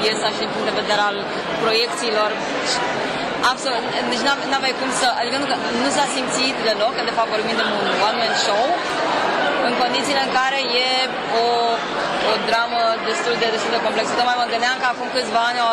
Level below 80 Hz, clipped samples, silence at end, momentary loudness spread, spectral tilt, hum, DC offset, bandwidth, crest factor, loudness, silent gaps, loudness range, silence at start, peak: -56 dBFS; under 0.1%; 0 s; 3 LU; -2.5 dB/octave; none; under 0.1%; 15 kHz; 12 dB; -19 LUFS; none; 1 LU; 0 s; -8 dBFS